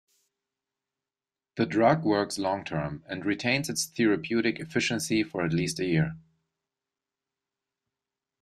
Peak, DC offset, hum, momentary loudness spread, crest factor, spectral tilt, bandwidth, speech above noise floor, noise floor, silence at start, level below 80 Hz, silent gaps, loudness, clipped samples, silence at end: -10 dBFS; under 0.1%; none; 9 LU; 20 dB; -5 dB/octave; 15 kHz; over 63 dB; under -90 dBFS; 1.55 s; -62 dBFS; none; -27 LUFS; under 0.1%; 2.2 s